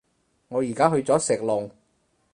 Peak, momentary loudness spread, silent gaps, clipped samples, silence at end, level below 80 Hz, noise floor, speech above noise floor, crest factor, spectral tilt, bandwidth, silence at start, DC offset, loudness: -4 dBFS; 9 LU; none; under 0.1%; 0.65 s; -64 dBFS; -68 dBFS; 46 dB; 22 dB; -5 dB/octave; 11 kHz; 0.5 s; under 0.1%; -23 LUFS